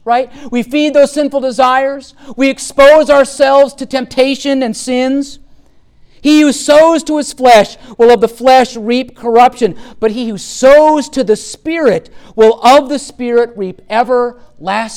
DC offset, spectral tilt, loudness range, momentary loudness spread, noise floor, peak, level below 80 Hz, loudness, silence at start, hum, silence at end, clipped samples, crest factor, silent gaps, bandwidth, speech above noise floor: under 0.1%; -3.5 dB/octave; 3 LU; 12 LU; -43 dBFS; 0 dBFS; -42 dBFS; -10 LUFS; 0.05 s; none; 0 s; under 0.1%; 10 dB; none; 16 kHz; 33 dB